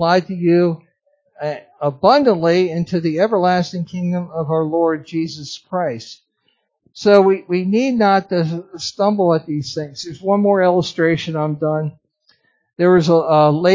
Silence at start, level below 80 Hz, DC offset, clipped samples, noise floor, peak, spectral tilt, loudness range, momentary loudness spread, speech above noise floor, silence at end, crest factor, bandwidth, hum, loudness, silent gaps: 0 s; -60 dBFS; under 0.1%; under 0.1%; -66 dBFS; 0 dBFS; -6.5 dB/octave; 3 LU; 13 LU; 50 dB; 0 s; 16 dB; 7.6 kHz; none; -17 LUFS; none